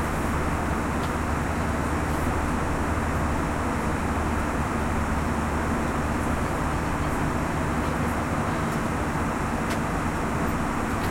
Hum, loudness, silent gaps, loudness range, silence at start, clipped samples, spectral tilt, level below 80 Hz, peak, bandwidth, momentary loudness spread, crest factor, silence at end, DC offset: none; -26 LUFS; none; 0 LU; 0 s; under 0.1%; -6 dB/octave; -34 dBFS; -14 dBFS; 16.5 kHz; 1 LU; 12 dB; 0 s; under 0.1%